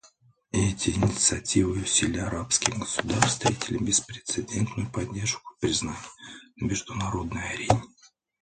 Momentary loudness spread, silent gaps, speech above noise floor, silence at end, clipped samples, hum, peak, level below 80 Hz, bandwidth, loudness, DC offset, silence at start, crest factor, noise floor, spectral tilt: 9 LU; none; 33 dB; 0.35 s; under 0.1%; none; 0 dBFS; -46 dBFS; 9.8 kHz; -26 LUFS; under 0.1%; 0.55 s; 28 dB; -60 dBFS; -3.5 dB/octave